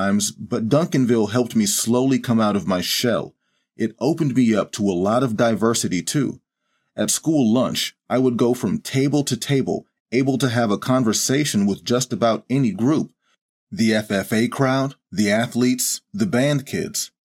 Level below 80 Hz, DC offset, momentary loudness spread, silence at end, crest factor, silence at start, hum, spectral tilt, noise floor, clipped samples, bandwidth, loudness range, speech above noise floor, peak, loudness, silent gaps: -62 dBFS; under 0.1%; 7 LU; 0.25 s; 18 dB; 0 s; none; -4.5 dB/octave; -72 dBFS; under 0.1%; 16.5 kHz; 1 LU; 53 dB; -2 dBFS; -20 LUFS; 10.00-10.05 s, 13.41-13.67 s